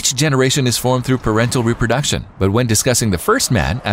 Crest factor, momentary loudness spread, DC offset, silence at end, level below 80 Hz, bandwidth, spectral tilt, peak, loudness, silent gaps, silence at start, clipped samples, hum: 12 dB; 3 LU; under 0.1%; 0 s; -34 dBFS; 16.5 kHz; -4 dB/octave; -2 dBFS; -15 LUFS; none; 0 s; under 0.1%; none